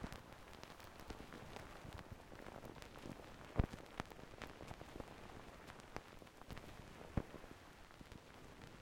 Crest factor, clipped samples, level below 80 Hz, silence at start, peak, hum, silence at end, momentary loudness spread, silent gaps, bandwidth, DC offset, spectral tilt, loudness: 34 dB; under 0.1%; -58 dBFS; 0 s; -18 dBFS; none; 0 s; 12 LU; none; 16.5 kHz; under 0.1%; -6 dB/octave; -53 LUFS